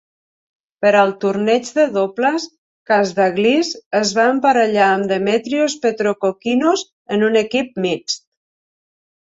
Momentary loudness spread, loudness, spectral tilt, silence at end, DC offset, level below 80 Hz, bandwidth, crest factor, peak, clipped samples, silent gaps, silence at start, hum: 7 LU; -17 LUFS; -4 dB/octave; 1.1 s; under 0.1%; -62 dBFS; 8 kHz; 14 dB; -2 dBFS; under 0.1%; 2.58-2.86 s, 3.86-3.91 s, 6.92-7.05 s; 0.8 s; none